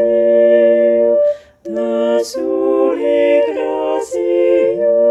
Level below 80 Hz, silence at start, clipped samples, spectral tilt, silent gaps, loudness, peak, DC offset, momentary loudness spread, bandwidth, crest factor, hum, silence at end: -56 dBFS; 0 s; under 0.1%; -5 dB/octave; none; -14 LUFS; -2 dBFS; under 0.1%; 8 LU; 12 kHz; 12 dB; none; 0 s